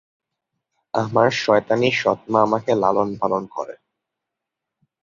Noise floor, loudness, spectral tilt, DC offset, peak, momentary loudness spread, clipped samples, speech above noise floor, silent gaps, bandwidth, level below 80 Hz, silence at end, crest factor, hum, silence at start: -83 dBFS; -19 LUFS; -5.5 dB/octave; under 0.1%; -2 dBFS; 10 LU; under 0.1%; 64 dB; none; 7.6 kHz; -60 dBFS; 1.3 s; 20 dB; none; 0.95 s